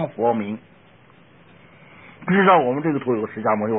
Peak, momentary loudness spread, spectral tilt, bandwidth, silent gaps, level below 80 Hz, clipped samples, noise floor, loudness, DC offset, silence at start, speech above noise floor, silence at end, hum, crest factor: -4 dBFS; 16 LU; -11.5 dB/octave; 3.8 kHz; none; -64 dBFS; under 0.1%; -51 dBFS; -20 LUFS; 0.1%; 0 s; 32 dB; 0 s; none; 18 dB